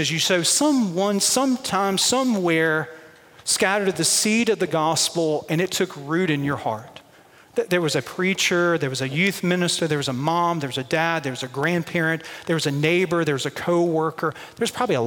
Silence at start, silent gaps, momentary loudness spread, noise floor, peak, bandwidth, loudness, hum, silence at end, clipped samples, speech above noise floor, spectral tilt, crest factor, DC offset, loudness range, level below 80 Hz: 0 s; none; 7 LU; -51 dBFS; -6 dBFS; 17 kHz; -21 LUFS; none; 0 s; under 0.1%; 29 dB; -3.5 dB/octave; 16 dB; under 0.1%; 3 LU; -64 dBFS